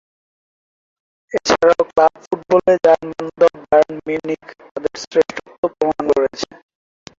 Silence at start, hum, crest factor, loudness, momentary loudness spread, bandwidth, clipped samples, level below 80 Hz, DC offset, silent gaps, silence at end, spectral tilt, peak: 1.3 s; none; 16 dB; -17 LUFS; 13 LU; 7.6 kHz; under 0.1%; -54 dBFS; under 0.1%; 2.27-2.31 s, 4.71-4.75 s, 5.07-5.11 s, 5.58-5.63 s; 0.75 s; -4.5 dB/octave; -2 dBFS